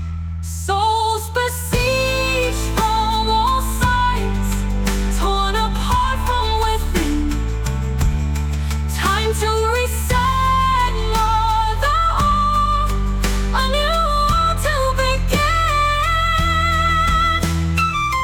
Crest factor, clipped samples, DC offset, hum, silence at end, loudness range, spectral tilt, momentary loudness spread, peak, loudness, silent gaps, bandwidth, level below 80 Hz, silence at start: 12 dB; under 0.1%; under 0.1%; none; 0 s; 3 LU; -4.5 dB/octave; 5 LU; -6 dBFS; -18 LUFS; none; 19 kHz; -22 dBFS; 0 s